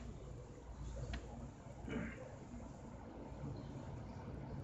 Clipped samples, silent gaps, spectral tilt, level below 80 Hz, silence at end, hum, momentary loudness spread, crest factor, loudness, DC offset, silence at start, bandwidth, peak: under 0.1%; none; -7 dB/octave; -54 dBFS; 0 s; none; 7 LU; 18 dB; -50 LUFS; under 0.1%; 0 s; 8.4 kHz; -32 dBFS